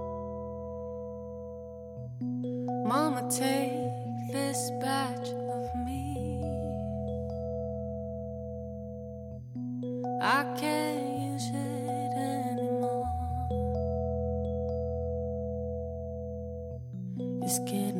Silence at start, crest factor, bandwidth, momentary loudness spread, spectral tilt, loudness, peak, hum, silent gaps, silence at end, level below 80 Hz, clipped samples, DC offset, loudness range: 0 s; 20 dB; 17 kHz; 11 LU; -5.5 dB/octave; -33 LUFS; -12 dBFS; none; none; 0 s; -46 dBFS; under 0.1%; under 0.1%; 5 LU